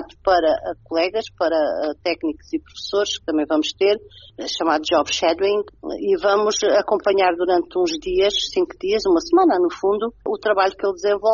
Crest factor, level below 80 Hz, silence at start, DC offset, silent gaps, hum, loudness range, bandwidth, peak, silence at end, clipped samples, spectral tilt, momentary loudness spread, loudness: 16 dB; -50 dBFS; 0 s; under 0.1%; none; none; 4 LU; 7.2 kHz; -4 dBFS; 0 s; under 0.1%; -1.5 dB/octave; 8 LU; -20 LUFS